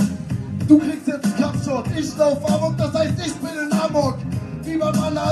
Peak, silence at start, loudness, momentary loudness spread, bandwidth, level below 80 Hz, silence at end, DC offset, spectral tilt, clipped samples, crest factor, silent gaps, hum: 0 dBFS; 0 s; -21 LUFS; 11 LU; 13 kHz; -46 dBFS; 0 s; under 0.1%; -6.5 dB/octave; under 0.1%; 20 dB; none; none